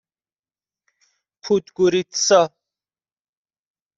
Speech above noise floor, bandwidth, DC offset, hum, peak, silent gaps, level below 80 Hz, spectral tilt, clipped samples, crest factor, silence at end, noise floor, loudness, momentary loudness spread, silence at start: over 72 dB; 7.8 kHz; under 0.1%; none; -2 dBFS; none; -68 dBFS; -3.5 dB/octave; under 0.1%; 22 dB; 1.5 s; under -90 dBFS; -19 LUFS; 8 LU; 1.45 s